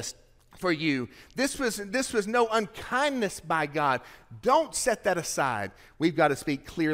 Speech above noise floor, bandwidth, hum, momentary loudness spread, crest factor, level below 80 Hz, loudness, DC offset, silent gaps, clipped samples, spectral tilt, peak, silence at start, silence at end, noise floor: 24 dB; 16 kHz; none; 8 LU; 18 dB; -56 dBFS; -28 LUFS; under 0.1%; none; under 0.1%; -4 dB/octave; -10 dBFS; 0 s; 0 s; -52 dBFS